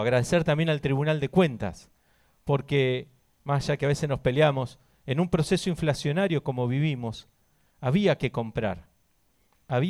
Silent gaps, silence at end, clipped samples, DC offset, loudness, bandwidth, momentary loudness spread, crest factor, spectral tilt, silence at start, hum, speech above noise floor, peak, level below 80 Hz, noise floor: none; 0 s; under 0.1%; under 0.1%; -26 LUFS; 12.5 kHz; 12 LU; 18 dB; -6.5 dB/octave; 0 s; none; 43 dB; -8 dBFS; -50 dBFS; -68 dBFS